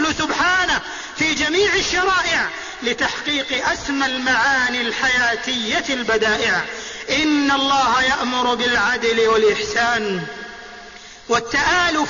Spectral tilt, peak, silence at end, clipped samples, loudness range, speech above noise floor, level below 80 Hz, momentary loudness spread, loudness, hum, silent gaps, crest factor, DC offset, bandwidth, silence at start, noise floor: -2 dB/octave; -6 dBFS; 0 s; under 0.1%; 2 LU; 21 dB; -46 dBFS; 10 LU; -18 LUFS; none; none; 12 dB; under 0.1%; 7.4 kHz; 0 s; -39 dBFS